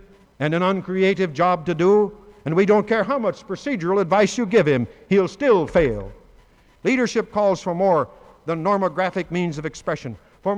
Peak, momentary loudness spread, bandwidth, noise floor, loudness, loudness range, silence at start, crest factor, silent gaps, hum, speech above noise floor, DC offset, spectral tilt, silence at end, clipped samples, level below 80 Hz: -6 dBFS; 11 LU; 9.8 kHz; -53 dBFS; -21 LUFS; 3 LU; 0.4 s; 14 dB; none; none; 33 dB; under 0.1%; -6.5 dB/octave; 0 s; under 0.1%; -48 dBFS